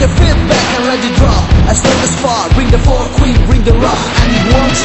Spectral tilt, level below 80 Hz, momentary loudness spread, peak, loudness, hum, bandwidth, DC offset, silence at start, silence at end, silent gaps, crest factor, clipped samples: -5 dB/octave; -12 dBFS; 2 LU; 0 dBFS; -10 LUFS; none; 8.4 kHz; under 0.1%; 0 s; 0 s; none; 8 dB; 0.6%